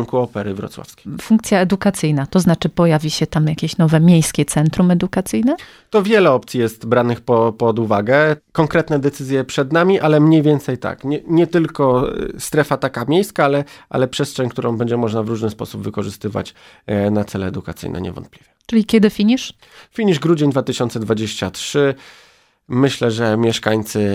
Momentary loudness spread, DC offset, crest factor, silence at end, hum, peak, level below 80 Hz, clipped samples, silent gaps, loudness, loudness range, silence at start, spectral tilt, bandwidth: 12 LU; under 0.1%; 16 dB; 0 s; none; 0 dBFS; -46 dBFS; under 0.1%; none; -17 LUFS; 6 LU; 0 s; -6 dB/octave; 15.5 kHz